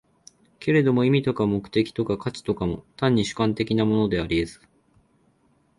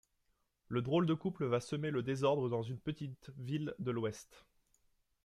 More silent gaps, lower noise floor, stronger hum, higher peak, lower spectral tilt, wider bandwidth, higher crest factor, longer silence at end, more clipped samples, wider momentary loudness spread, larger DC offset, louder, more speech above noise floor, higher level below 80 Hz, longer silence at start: neither; second, -64 dBFS vs -80 dBFS; neither; first, -8 dBFS vs -20 dBFS; about the same, -7 dB/octave vs -7 dB/octave; second, 11.5 kHz vs 13 kHz; about the same, 16 dB vs 18 dB; first, 1.25 s vs 0.85 s; neither; about the same, 8 LU vs 10 LU; neither; first, -24 LUFS vs -37 LUFS; about the same, 41 dB vs 43 dB; first, -48 dBFS vs -70 dBFS; about the same, 0.6 s vs 0.7 s